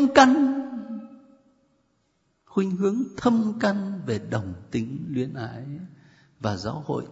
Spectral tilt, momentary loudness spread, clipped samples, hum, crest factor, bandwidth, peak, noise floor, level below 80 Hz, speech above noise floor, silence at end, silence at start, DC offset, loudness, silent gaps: -6 dB/octave; 16 LU; under 0.1%; none; 24 dB; 8 kHz; 0 dBFS; -70 dBFS; -60 dBFS; 46 dB; 0 s; 0 s; under 0.1%; -25 LUFS; none